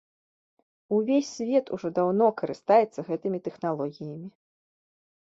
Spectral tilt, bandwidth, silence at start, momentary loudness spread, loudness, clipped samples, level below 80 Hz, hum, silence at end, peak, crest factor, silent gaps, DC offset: -6.5 dB/octave; 7.8 kHz; 0.9 s; 14 LU; -26 LUFS; under 0.1%; -74 dBFS; none; 1 s; -8 dBFS; 20 dB; none; under 0.1%